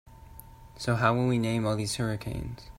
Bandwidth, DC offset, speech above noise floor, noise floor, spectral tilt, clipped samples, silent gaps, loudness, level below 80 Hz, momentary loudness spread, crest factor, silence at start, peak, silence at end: 16 kHz; under 0.1%; 21 dB; -49 dBFS; -5.5 dB/octave; under 0.1%; none; -29 LUFS; -48 dBFS; 23 LU; 22 dB; 0.05 s; -8 dBFS; 0 s